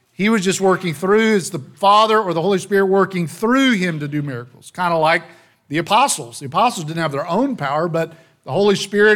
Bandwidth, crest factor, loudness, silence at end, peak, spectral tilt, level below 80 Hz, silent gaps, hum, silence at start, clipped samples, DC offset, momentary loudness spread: 17 kHz; 14 dB; -17 LUFS; 0 s; -2 dBFS; -4.5 dB/octave; -60 dBFS; none; none; 0.2 s; under 0.1%; under 0.1%; 9 LU